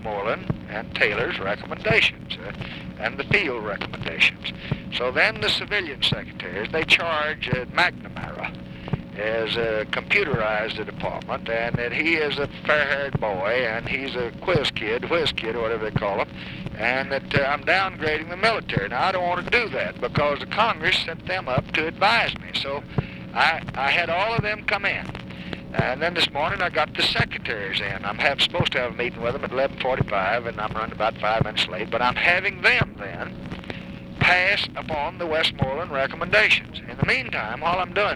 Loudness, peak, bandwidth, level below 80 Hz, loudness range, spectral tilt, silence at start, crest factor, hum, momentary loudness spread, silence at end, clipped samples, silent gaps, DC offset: -23 LUFS; -4 dBFS; 15 kHz; -46 dBFS; 3 LU; -5 dB/octave; 0 s; 20 dB; none; 12 LU; 0 s; under 0.1%; none; under 0.1%